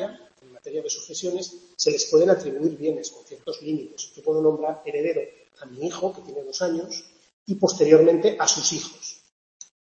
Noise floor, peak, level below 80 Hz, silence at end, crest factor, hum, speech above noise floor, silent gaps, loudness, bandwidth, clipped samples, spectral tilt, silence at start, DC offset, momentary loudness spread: -51 dBFS; -2 dBFS; -72 dBFS; 0.75 s; 22 dB; none; 27 dB; 7.33-7.46 s; -23 LUFS; 8 kHz; under 0.1%; -3.5 dB/octave; 0 s; under 0.1%; 18 LU